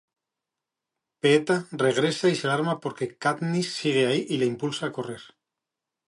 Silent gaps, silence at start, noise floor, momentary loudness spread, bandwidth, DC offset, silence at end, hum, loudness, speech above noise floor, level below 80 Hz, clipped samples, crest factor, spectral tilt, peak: none; 1.25 s; -87 dBFS; 10 LU; 11.5 kHz; under 0.1%; 0.8 s; none; -25 LUFS; 62 dB; -74 dBFS; under 0.1%; 20 dB; -5 dB/octave; -8 dBFS